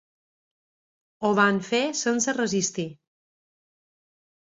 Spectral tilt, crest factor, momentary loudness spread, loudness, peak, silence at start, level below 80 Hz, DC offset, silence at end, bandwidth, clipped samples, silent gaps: -3.5 dB/octave; 22 dB; 8 LU; -24 LUFS; -6 dBFS; 1.2 s; -70 dBFS; under 0.1%; 1.65 s; 7.8 kHz; under 0.1%; none